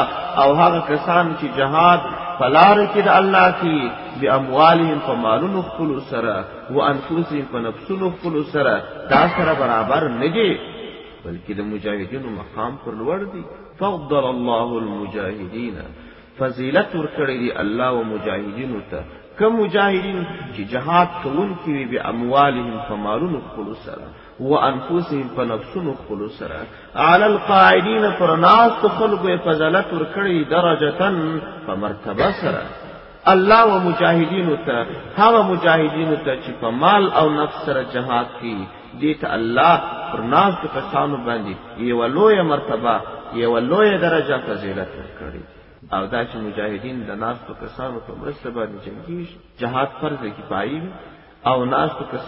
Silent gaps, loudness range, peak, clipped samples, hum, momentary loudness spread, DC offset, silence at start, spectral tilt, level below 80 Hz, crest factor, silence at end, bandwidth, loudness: none; 11 LU; 0 dBFS; under 0.1%; none; 17 LU; under 0.1%; 0 s; -9 dB/octave; -48 dBFS; 18 dB; 0 s; 5.8 kHz; -18 LUFS